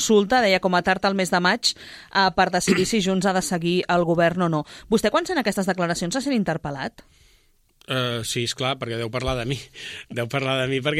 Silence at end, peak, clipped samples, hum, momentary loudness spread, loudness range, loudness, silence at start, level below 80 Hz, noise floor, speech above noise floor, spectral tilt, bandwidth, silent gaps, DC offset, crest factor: 0 s; -6 dBFS; under 0.1%; none; 10 LU; 7 LU; -22 LUFS; 0 s; -48 dBFS; -60 dBFS; 38 dB; -4.5 dB/octave; 15.5 kHz; none; under 0.1%; 18 dB